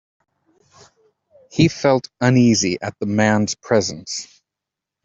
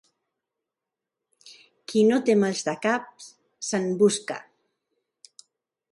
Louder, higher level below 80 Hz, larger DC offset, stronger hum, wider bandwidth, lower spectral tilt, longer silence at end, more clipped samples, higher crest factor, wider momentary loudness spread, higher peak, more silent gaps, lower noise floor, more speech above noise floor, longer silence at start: first, -18 LUFS vs -24 LUFS; first, -54 dBFS vs -72 dBFS; neither; neither; second, 8 kHz vs 11.5 kHz; about the same, -5 dB/octave vs -4.5 dB/octave; second, 0.8 s vs 1.5 s; neither; about the same, 18 dB vs 20 dB; about the same, 14 LU vs 16 LU; first, -2 dBFS vs -8 dBFS; neither; about the same, -85 dBFS vs -87 dBFS; about the same, 67 dB vs 64 dB; about the same, 1.55 s vs 1.45 s